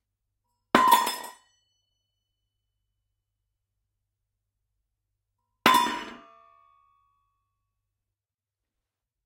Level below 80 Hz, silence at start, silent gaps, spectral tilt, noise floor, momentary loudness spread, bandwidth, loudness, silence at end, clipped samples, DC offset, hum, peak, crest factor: -70 dBFS; 0.75 s; none; -2 dB/octave; under -90 dBFS; 20 LU; 16.5 kHz; -22 LUFS; 3.1 s; under 0.1%; under 0.1%; none; -2 dBFS; 30 dB